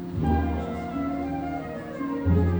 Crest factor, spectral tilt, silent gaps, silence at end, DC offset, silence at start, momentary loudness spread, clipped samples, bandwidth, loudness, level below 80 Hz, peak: 16 dB; -9.5 dB/octave; none; 0 s; under 0.1%; 0 s; 8 LU; under 0.1%; over 20 kHz; -28 LUFS; -36 dBFS; -10 dBFS